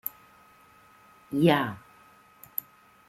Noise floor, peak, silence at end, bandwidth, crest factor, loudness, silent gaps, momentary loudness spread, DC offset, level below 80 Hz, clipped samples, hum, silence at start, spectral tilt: -57 dBFS; -8 dBFS; 1.3 s; 16.5 kHz; 22 dB; -28 LUFS; none; 15 LU; under 0.1%; -68 dBFS; under 0.1%; none; 1.3 s; -6.5 dB/octave